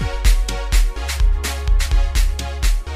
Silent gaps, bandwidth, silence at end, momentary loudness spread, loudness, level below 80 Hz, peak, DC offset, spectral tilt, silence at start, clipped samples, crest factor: none; 15.5 kHz; 0 s; 3 LU; -21 LUFS; -16 dBFS; -4 dBFS; under 0.1%; -3.5 dB/octave; 0 s; under 0.1%; 12 dB